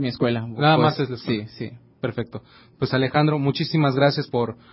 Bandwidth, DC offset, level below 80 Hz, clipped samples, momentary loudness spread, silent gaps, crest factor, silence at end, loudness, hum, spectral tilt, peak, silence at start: 5.8 kHz; under 0.1%; -56 dBFS; under 0.1%; 15 LU; none; 18 dB; 0.2 s; -22 LUFS; none; -10.5 dB/octave; -4 dBFS; 0 s